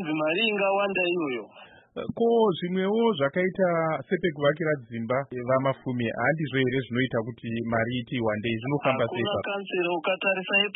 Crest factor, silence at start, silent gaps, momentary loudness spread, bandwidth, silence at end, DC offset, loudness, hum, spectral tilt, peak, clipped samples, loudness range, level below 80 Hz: 16 dB; 0 s; none; 6 LU; 4.1 kHz; 0 s; under 0.1%; -26 LUFS; none; -10.5 dB/octave; -10 dBFS; under 0.1%; 2 LU; -62 dBFS